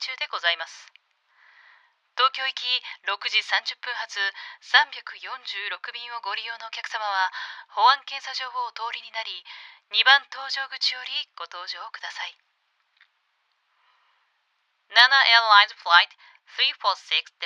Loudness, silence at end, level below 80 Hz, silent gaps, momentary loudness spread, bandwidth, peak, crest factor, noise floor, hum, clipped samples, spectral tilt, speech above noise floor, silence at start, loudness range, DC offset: -22 LUFS; 0 s; under -90 dBFS; none; 18 LU; 12 kHz; 0 dBFS; 26 dB; -72 dBFS; none; under 0.1%; 4 dB/octave; 47 dB; 0 s; 12 LU; under 0.1%